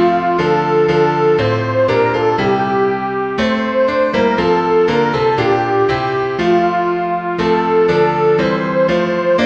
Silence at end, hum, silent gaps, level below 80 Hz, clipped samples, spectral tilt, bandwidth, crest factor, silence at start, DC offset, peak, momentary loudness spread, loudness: 0 s; none; none; -44 dBFS; under 0.1%; -7 dB/octave; 7.6 kHz; 12 dB; 0 s; 0.2%; -2 dBFS; 4 LU; -14 LUFS